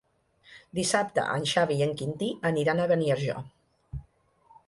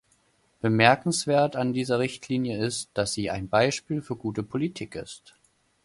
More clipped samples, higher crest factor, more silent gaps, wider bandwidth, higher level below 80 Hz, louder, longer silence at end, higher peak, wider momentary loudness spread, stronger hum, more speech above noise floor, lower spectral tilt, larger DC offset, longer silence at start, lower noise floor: neither; second, 18 dB vs 24 dB; neither; about the same, 11.5 kHz vs 11.5 kHz; about the same, -56 dBFS vs -58 dBFS; about the same, -27 LUFS vs -26 LUFS; about the same, 0.65 s vs 0.65 s; second, -12 dBFS vs -2 dBFS; first, 18 LU vs 13 LU; neither; second, 35 dB vs 40 dB; about the same, -4.5 dB/octave vs -4.5 dB/octave; neither; second, 0.5 s vs 0.65 s; second, -62 dBFS vs -66 dBFS